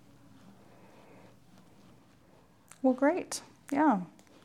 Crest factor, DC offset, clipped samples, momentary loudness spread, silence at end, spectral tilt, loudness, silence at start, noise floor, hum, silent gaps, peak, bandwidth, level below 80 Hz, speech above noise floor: 20 dB; under 0.1%; under 0.1%; 12 LU; 0.4 s; -5 dB/octave; -30 LUFS; 2.85 s; -62 dBFS; none; none; -14 dBFS; 14 kHz; -76 dBFS; 33 dB